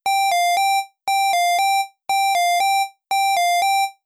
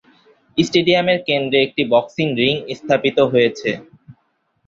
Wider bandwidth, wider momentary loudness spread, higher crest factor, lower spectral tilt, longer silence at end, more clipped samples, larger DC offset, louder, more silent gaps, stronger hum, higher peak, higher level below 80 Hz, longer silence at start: first, 14 kHz vs 7.8 kHz; second, 5 LU vs 9 LU; second, 4 dB vs 18 dB; second, 3 dB/octave vs -5.5 dB/octave; second, 0.15 s vs 0.55 s; neither; neither; about the same, -18 LUFS vs -17 LUFS; neither; neither; second, -16 dBFS vs 0 dBFS; second, -72 dBFS vs -56 dBFS; second, 0.05 s vs 0.55 s